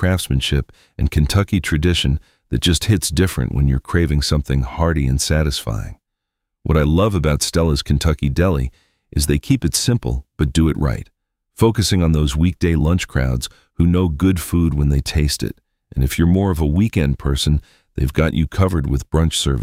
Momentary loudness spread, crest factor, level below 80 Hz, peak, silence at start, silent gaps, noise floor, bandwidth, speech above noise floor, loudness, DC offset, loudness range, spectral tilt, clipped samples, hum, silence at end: 7 LU; 16 dB; -24 dBFS; -2 dBFS; 0 s; none; -79 dBFS; 16 kHz; 62 dB; -18 LUFS; under 0.1%; 1 LU; -5.5 dB/octave; under 0.1%; none; 0 s